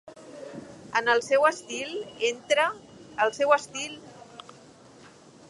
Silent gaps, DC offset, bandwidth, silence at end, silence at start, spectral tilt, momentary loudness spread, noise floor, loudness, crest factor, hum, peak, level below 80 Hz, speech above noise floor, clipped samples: none; under 0.1%; 11.5 kHz; 1.1 s; 0.05 s; -2 dB/octave; 23 LU; -52 dBFS; -26 LUFS; 22 dB; none; -6 dBFS; -72 dBFS; 26 dB; under 0.1%